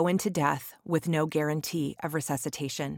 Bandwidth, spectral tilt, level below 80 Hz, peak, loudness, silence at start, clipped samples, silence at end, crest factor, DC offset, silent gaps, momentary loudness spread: 18 kHz; -5 dB/octave; -66 dBFS; -10 dBFS; -30 LUFS; 0 s; under 0.1%; 0 s; 18 dB; under 0.1%; none; 6 LU